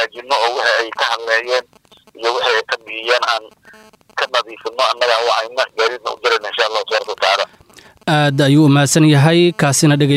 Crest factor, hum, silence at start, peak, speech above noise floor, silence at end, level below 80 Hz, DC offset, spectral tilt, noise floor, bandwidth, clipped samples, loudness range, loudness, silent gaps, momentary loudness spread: 14 dB; none; 0 s; -2 dBFS; 30 dB; 0 s; -62 dBFS; under 0.1%; -4.5 dB/octave; -45 dBFS; 14.5 kHz; under 0.1%; 5 LU; -15 LUFS; none; 10 LU